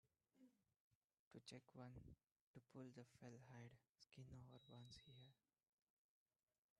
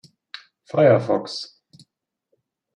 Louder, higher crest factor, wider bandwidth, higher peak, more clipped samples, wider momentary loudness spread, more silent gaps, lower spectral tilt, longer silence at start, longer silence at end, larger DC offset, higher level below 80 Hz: second, -64 LUFS vs -20 LUFS; about the same, 20 dB vs 20 dB; about the same, 10 kHz vs 10.5 kHz; second, -46 dBFS vs -4 dBFS; neither; second, 6 LU vs 24 LU; first, 0.76-1.08 s, 1.19-1.31 s, 2.32-2.54 s, 3.89-3.95 s vs none; about the same, -5.5 dB/octave vs -6.5 dB/octave; second, 0.05 s vs 0.75 s; first, 1.45 s vs 1.3 s; neither; second, -84 dBFS vs -72 dBFS